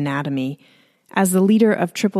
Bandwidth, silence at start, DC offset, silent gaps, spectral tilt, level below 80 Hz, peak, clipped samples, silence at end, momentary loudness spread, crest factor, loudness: 15 kHz; 0 s; under 0.1%; none; -5.5 dB/octave; -66 dBFS; -2 dBFS; under 0.1%; 0 s; 12 LU; 16 dB; -18 LUFS